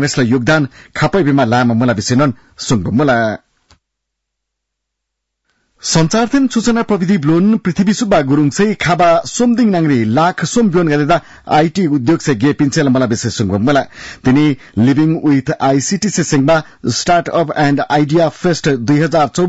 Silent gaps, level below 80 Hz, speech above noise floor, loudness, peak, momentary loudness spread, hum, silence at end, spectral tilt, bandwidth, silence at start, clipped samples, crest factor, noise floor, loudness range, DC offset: none; -44 dBFS; 63 dB; -13 LUFS; -2 dBFS; 4 LU; none; 0 s; -5.5 dB/octave; 8 kHz; 0 s; under 0.1%; 10 dB; -76 dBFS; 5 LU; under 0.1%